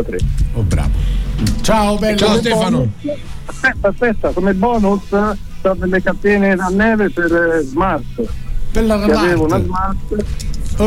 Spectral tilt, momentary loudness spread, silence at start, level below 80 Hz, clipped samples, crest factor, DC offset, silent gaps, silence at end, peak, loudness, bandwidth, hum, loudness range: -6 dB/octave; 10 LU; 0 s; -22 dBFS; under 0.1%; 10 dB; under 0.1%; none; 0 s; -4 dBFS; -16 LUFS; 16 kHz; none; 2 LU